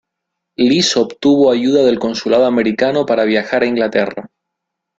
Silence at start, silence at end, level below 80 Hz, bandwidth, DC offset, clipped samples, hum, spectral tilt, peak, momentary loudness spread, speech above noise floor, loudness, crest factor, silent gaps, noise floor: 0.6 s; 0.7 s; -54 dBFS; 8.4 kHz; under 0.1%; under 0.1%; none; -4.5 dB/octave; 0 dBFS; 6 LU; 64 dB; -14 LUFS; 14 dB; none; -78 dBFS